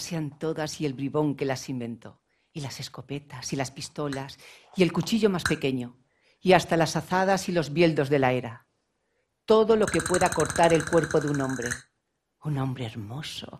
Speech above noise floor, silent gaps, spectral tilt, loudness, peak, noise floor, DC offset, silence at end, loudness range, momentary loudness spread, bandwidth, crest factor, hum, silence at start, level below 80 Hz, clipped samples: 52 dB; none; -5 dB/octave; -26 LUFS; -4 dBFS; -78 dBFS; under 0.1%; 0 s; 8 LU; 16 LU; 15 kHz; 24 dB; none; 0 s; -56 dBFS; under 0.1%